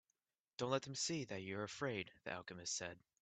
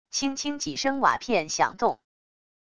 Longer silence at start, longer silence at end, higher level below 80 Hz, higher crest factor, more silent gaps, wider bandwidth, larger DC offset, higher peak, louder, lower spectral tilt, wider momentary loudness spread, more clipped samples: first, 0.6 s vs 0.05 s; second, 0.25 s vs 0.7 s; second, -80 dBFS vs -60 dBFS; about the same, 22 dB vs 20 dB; neither; second, 9 kHz vs 11 kHz; neither; second, -24 dBFS vs -6 dBFS; second, -44 LUFS vs -26 LUFS; about the same, -3.5 dB/octave vs -2.5 dB/octave; about the same, 8 LU vs 7 LU; neither